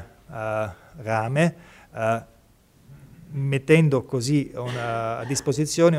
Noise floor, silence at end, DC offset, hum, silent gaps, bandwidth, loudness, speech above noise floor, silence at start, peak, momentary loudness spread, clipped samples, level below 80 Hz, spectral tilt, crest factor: -56 dBFS; 0 s; under 0.1%; none; none; 14.5 kHz; -24 LUFS; 33 dB; 0 s; -4 dBFS; 15 LU; under 0.1%; -56 dBFS; -6 dB/octave; 20 dB